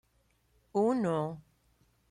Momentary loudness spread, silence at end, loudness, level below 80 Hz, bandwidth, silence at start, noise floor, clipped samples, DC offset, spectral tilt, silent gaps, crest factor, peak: 12 LU; 0.7 s; -32 LUFS; -70 dBFS; 11.5 kHz; 0.75 s; -72 dBFS; under 0.1%; under 0.1%; -8 dB/octave; none; 16 dB; -18 dBFS